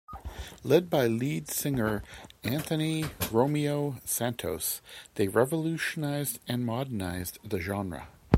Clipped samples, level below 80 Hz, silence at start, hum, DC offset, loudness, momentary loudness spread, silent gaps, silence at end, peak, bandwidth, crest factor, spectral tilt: under 0.1%; -52 dBFS; 0.1 s; none; under 0.1%; -30 LUFS; 11 LU; none; 0 s; -6 dBFS; 16.5 kHz; 24 dB; -5 dB/octave